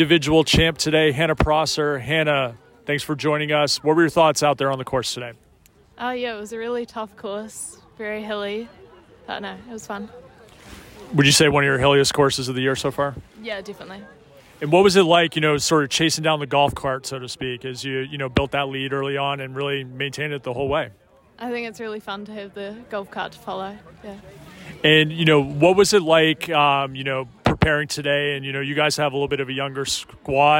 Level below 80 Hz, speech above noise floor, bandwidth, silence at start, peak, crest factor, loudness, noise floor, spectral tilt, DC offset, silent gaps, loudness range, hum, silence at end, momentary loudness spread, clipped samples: -44 dBFS; 34 dB; 16.5 kHz; 0 s; -4 dBFS; 18 dB; -20 LUFS; -54 dBFS; -4 dB/octave; under 0.1%; none; 12 LU; none; 0 s; 18 LU; under 0.1%